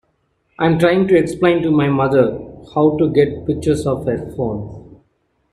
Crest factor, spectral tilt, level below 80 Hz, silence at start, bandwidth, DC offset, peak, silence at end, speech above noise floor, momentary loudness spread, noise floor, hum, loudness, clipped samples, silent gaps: 16 dB; -7.5 dB/octave; -44 dBFS; 0.6 s; 13 kHz; under 0.1%; -2 dBFS; 0.6 s; 49 dB; 9 LU; -65 dBFS; none; -16 LUFS; under 0.1%; none